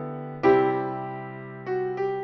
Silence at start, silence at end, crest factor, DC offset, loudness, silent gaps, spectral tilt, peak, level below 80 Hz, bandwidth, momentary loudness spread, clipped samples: 0 s; 0 s; 20 dB; under 0.1%; -25 LUFS; none; -9 dB/octave; -6 dBFS; -62 dBFS; 6 kHz; 16 LU; under 0.1%